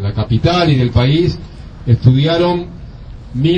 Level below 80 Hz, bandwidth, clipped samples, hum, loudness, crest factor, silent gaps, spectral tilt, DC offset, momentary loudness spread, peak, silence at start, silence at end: -30 dBFS; 7.2 kHz; under 0.1%; none; -13 LUFS; 14 dB; none; -8 dB/octave; under 0.1%; 22 LU; 0 dBFS; 0 s; 0 s